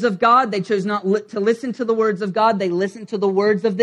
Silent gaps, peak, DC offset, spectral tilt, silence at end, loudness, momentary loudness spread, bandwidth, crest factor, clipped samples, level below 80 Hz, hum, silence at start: none; -2 dBFS; under 0.1%; -6.5 dB/octave; 0 s; -19 LUFS; 7 LU; 10 kHz; 16 dB; under 0.1%; -68 dBFS; none; 0 s